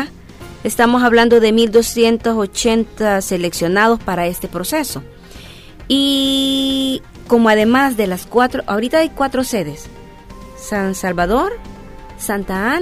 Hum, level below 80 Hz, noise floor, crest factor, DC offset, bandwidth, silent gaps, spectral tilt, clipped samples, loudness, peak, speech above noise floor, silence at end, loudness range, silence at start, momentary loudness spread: none; -38 dBFS; -36 dBFS; 16 dB; under 0.1%; 16 kHz; none; -4 dB/octave; under 0.1%; -15 LUFS; 0 dBFS; 21 dB; 0 s; 6 LU; 0 s; 14 LU